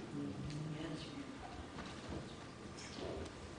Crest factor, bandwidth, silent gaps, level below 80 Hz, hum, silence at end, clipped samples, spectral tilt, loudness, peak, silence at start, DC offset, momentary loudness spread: 14 dB; 10 kHz; none; -62 dBFS; none; 0 s; under 0.1%; -5.5 dB/octave; -47 LUFS; -34 dBFS; 0 s; under 0.1%; 5 LU